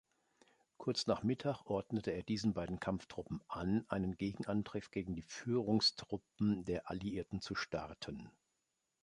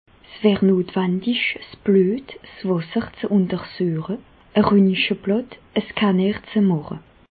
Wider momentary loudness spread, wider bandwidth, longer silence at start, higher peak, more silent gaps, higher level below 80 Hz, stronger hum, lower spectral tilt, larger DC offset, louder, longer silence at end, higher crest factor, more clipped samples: about the same, 11 LU vs 11 LU; first, 11 kHz vs 4.8 kHz; first, 0.8 s vs 0.3 s; second, -20 dBFS vs -4 dBFS; neither; second, -62 dBFS vs -54 dBFS; neither; second, -5.5 dB/octave vs -11.5 dB/octave; neither; second, -39 LUFS vs -21 LUFS; first, 0.75 s vs 0.35 s; about the same, 20 dB vs 18 dB; neither